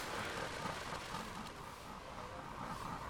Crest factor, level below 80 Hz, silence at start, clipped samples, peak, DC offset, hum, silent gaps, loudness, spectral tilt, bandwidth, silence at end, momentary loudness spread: 16 dB; -60 dBFS; 0 s; under 0.1%; -28 dBFS; under 0.1%; none; none; -45 LUFS; -3.5 dB/octave; 19.5 kHz; 0 s; 8 LU